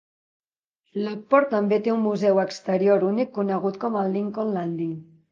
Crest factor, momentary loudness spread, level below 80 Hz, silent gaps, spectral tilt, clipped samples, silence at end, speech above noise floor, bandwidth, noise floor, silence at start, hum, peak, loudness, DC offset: 20 dB; 10 LU; -74 dBFS; none; -7.5 dB/octave; under 0.1%; 0.3 s; 55 dB; 7.4 kHz; -78 dBFS; 0.95 s; none; -4 dBFS; -23 LUFS; under 0.1%